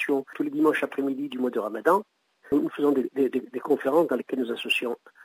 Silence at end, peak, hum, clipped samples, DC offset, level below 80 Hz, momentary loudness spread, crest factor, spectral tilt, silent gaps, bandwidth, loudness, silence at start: 0.3 s; -8 dBFS; none; under 0.1%; under 0.1%; -72 dBFS; 6 LU; 18 dB; -5 dB/octave; none; 16 kHz; -26 LUFS; 0 s